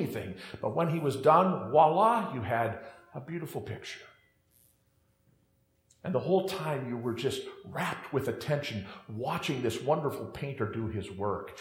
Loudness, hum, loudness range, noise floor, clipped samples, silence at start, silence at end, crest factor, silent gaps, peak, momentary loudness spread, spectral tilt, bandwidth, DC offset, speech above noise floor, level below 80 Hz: -31 LUFS; none; 11 LU; -71 dBFS; under 0.1%; 0 s; 0 s; 22 dB; none; -10 dBFS; 16 LU; -6 dB/octave; 16.5 kHz; under 0.1%; 40 dB; -68 dBFS